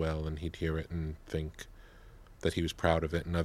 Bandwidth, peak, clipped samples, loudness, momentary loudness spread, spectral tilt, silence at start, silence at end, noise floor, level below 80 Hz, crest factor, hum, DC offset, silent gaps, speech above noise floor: 14.5 kHz; -10 dBFS; under 0.1%; -35 LUFS; 11 LU; -6.5 dB/octave; 0 s; 0 s; -54 dBFS; -44 dBFS; 24 dB; none; under 0.1%; none; 20 dB